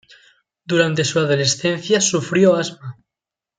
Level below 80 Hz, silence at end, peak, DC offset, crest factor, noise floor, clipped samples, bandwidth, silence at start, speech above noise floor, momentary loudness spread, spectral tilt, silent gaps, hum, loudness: -62 dBFS; 0.65 s; -2 dBFS; under 0.1%; 18 dB; -87 dBFS; under 0.1%; 10 kHz; 0.7 s; 70 dB; 10 LU; -4 dB/octave; none; none; -17 LUFS